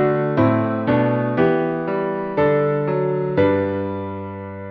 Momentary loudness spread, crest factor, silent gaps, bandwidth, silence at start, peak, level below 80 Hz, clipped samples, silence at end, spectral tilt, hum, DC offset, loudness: 10 LU; 14 dB; none; 5.6 kHz; 0 s; -4 dBFS; -52 dBFS; under 0.1%; 0 s; -10.5 dB/octave; none; under 0.1%; -20 LUFS